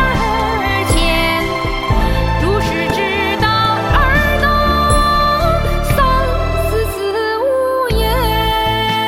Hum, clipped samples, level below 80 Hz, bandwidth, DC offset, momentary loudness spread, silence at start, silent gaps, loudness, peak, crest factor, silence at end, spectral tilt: none; under 0.1%; -20 dBFS; 16.5 kHz; under 0.1%; 4 LU; 0 s; none; -14 LUFS; 0 dBFS; 14 dB; 0 s; -5 dB/octave